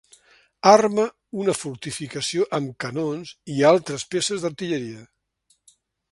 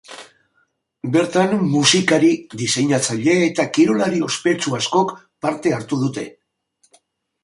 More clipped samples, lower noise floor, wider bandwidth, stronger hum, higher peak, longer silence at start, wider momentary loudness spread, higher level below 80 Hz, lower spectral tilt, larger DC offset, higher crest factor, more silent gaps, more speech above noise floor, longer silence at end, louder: neither; about the same, -67 dBFS vs -65 dBFS; about the same, 11.5 kHz vs 11.5 kHz; neither; about the same, 0 dBFS vs -2 dBFS; first, 0.65 s vs 0.1 s; first, 15 LU vs 11 LU; about the same, -64 dBFS vs -62 dBFS; about the same, -4.5 dB/octave vs -4 dB/octave; neither; about the same, 22 dB vs 18 dB; neither; about the same, 45 dB vs 48 dB; about the same, 1.1 s vs 1.15 s; second, -22 LUFS vs -18 LUFS